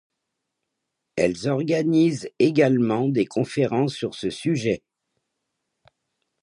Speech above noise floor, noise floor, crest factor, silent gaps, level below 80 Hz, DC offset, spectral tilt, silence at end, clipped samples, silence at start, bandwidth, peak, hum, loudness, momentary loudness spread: 59 dB; -80 dBFS; 18 dB; none; -60 dBFS; under 0.1%; -6.5 dB/octave; 1.65 s; under 0.1%; 1.15 s; 11 kHz; -6 dBFS; none; -22 LUFS; 8 LU